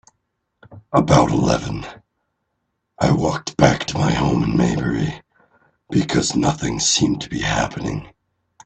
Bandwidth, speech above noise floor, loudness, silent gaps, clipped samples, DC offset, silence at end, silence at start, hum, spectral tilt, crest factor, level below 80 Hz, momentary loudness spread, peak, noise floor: 9 kHz; 55 dB; -19 LUFS; none; under 0.1%; under 0.1%; 0.6 s; 0.7 s; none; -5 dB/octave; 20 dB; -40 dBFS; 12 LU; 0 dBFS; -74 dBFS